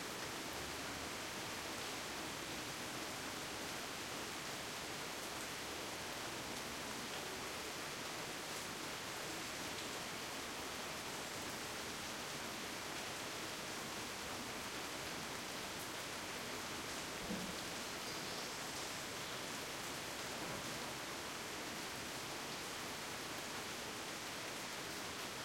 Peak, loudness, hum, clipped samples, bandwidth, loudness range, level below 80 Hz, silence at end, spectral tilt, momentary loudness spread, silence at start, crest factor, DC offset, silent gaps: -30 dBFS; -44 LUFS; none; under 0.1%; 16.5 kHz; 1 LU; -70 dBFS; 0 s; -2 dB/octave; 1 LU; 0 s; 16 dB; under 0.1%; none